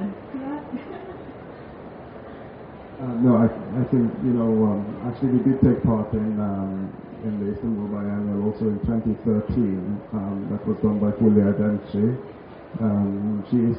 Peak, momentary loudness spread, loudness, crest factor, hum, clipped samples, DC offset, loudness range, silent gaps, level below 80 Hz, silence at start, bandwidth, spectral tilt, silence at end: -4 dBFS; 20 LU; -23 LUFS; 18 dB; none; under 0.1%; under 0.1%; 5 LU; none; -46 dBFS; 0 s; 4.3 kHz; -10 dB/octave; 0 s